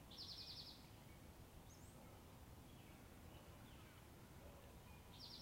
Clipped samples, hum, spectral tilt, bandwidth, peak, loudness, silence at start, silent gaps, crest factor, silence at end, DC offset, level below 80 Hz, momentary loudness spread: under 0.1%; none; -4 dB/octave; 16 kHz; -44 dBFS; -60 LUFS; 0 s; none; 16 dB; 0 s; under 0.1%; -68 dBFS; 9 LU